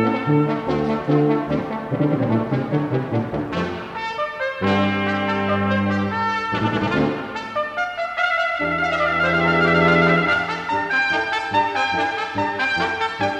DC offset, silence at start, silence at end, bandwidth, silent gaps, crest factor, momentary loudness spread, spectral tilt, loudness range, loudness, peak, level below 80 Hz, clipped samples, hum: under 0.1%; 0 s; 0 s; 10 kHz; none; 16 dB; 8 LU; -6.5 dB/octave; 4 LU; -20 LUFS; -4 dBFS; -48 dBFS; under 0.1%; none